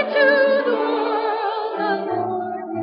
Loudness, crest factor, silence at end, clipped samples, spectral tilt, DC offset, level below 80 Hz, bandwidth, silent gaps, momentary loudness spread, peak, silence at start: -20 LUFS; 16 dB; 0 s; under 0.1%; -9 dB/octave; under 0.1%; -80 dBFS; 5.4 kHz; none; 9 LU; -4 dBFS; 0 s